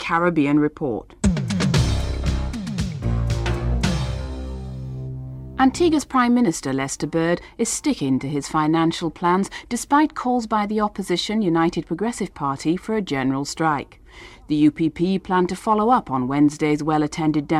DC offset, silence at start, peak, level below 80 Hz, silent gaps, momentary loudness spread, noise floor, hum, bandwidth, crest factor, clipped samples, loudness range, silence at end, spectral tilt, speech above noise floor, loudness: under 0.1%; 0 s; -6 dBFS; -34 dBFS; none; 9 LU; -43 dBFS; none; 14 kHz; 16 dB; under 0.1%; 3 LU; 0 s; -5.5 dB/octave; 23 dB; -21 LUFS